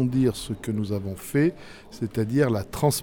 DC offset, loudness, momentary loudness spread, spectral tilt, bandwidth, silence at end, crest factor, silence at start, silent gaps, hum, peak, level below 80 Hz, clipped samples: under 0.1%; -26 LUFS; 10 LU; -6 dB/octave; 19 kHz; 0 s; 16 dB; 0 s; none; none; -8 dBFS; -48 dBFS; under 0.1%